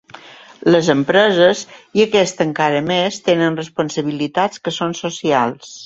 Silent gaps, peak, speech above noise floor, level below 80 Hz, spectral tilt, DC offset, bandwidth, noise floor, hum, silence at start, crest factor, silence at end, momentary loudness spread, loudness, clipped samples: none; 0 dBFS; 24 dB; -58 dBFS; -4.5 dB/octave; under 0.1%; 8 kHz; -40 dBFS; none; 0.25 s; 16 dB; 0 s; 9 LU; -16 LUFS; under 0.1%